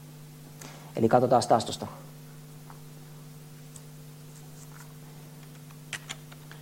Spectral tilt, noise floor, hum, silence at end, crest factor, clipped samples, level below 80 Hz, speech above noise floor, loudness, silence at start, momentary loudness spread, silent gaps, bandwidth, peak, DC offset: -5.5 dB/octave; -47 dBFS; none; 0 s; 24 dB; under 0.1%; -66 dBFS; 22 dB; -27 LUFS; 0 s; 24 LU; none; 16.5 kHz; -8 dBFS; under 0.1%